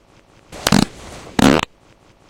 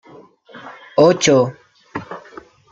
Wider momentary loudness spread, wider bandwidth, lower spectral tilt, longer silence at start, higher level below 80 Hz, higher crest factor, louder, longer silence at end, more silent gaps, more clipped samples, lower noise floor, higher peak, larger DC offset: second, 14 LU vs 25 LU; first, 17.5 kHz vs 9 kHz; about the same, -4.5 dB/octave vs -4.5 dB/octave; about the same, 0.5 s vs 0.55 s; first, -38 dBFS vs -58 dBFS; about the same, 20 dB vs 18 dB; about the same, -17 LUFS vs -15 LUFS; first, 0.7 s vs 0.55 s; neither; neither; first, -51 dBFS vs -45 dBFS; about the same, 0 dBFS vs -2 dBFS; neither